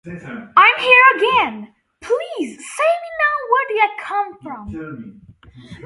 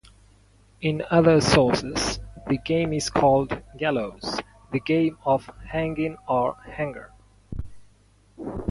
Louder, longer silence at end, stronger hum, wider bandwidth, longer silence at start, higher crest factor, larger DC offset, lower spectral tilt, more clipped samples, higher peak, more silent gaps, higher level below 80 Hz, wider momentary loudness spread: first, -15 LUFS vs -24 LUFS; about the same, 0 s vs 0 s; neither; about the same, 11.5 kHz vs 11.5 kHz; second, 0.05 s vs 0.8 s; about the same, 18 dB vs 20 dB; neither; second, -3.5 dB/octave vs -5.5 dB/octave; neither; first, 0 dBFS vs -4 dBFS; neither; second, -54 dBFS vs -44 dBFS; first, 23 LU vs 16 LU